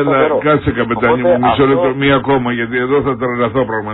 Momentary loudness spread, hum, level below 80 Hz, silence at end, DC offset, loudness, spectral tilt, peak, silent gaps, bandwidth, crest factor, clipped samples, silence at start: 5 LU; none; -38 dBFS; 0 s; under 0.1%; -13 LUFS; -10.5 dB/octave; 0 dBFS; none; 4.1 kHz; 14 dB; under 0.1%; 0 s